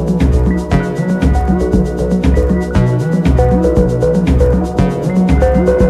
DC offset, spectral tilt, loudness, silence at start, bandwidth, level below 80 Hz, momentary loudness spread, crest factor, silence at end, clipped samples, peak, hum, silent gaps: under 0.1%; -8.5 dB/octave; -13 LUFS; 0 s; 11.5 kHz; -16 dBFS; 3 LU; 12 dB; 0 s; under 0.1%; 0 dBFS; none; none